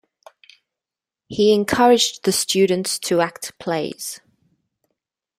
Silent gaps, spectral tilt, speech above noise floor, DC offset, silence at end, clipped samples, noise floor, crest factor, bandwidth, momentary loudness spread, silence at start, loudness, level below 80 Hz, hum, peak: none; -3.5 dB/octave; 70 dB; under 0.1%; 1.2 s; under 0.1%; -88 dBFS; 20 dB; 16 kHz; 16 LU; 1.3 s; -18 LUFS; -60 dBFS; none; -2 dBFS